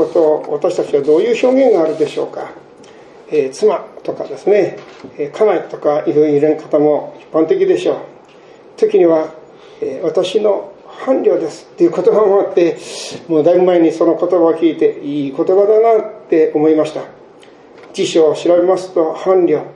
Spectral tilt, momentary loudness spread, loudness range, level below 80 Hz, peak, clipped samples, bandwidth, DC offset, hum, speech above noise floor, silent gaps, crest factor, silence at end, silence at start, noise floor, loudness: -6 dB/octave; 13 LU; 4 LU; -66 dBFS; 0 dBFS; under 0.1%; 11 kHz; under 0.1%; none; 28 dB; none; 14 dB; 0.05 s; 0 s; -41 dBFS; -14 LUFS